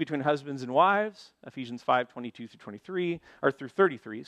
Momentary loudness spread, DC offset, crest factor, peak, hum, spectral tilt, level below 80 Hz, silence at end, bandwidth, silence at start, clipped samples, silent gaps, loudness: 20 LU; under 0.1%; 20 dB; -10 dBFS; none; -6.5 dB/octave; -74 dBFS; 0.05 s; 9.8 kHz; 0 s; under 0.1%; none; -28 LUFS